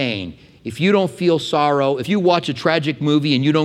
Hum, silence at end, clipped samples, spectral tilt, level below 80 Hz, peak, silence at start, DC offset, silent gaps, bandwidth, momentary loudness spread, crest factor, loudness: none; 0 s; under 0.1%; -6.5 dB/octave; -58 dBFS; -2 dBFS; 0 s; under 0.1%; none; 13 kHz; 10 LU; 16 dB; -18 LUFS